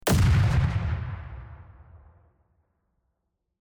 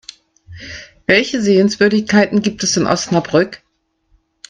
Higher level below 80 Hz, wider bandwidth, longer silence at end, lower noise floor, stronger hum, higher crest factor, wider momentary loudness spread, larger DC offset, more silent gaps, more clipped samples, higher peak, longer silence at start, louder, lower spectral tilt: first, -36 dBFS vs -50 dBFS; first, 16 kHz vs 9.6 kHz; first, 1.65 s vs 0.95 s; first, -79 dBFS vs -60 dBFS; neither; about the same, 14 dB vs 16 dB; first, 22 LU vs 18 LU; neither; neither; neither; second, -12 dBFS vs 0 dBFS; second, 0.05 s vs 0.5 s; second, -25 LUFS vs -14 LUFS; first, -6 dB/octave vs -4.5 dB/octave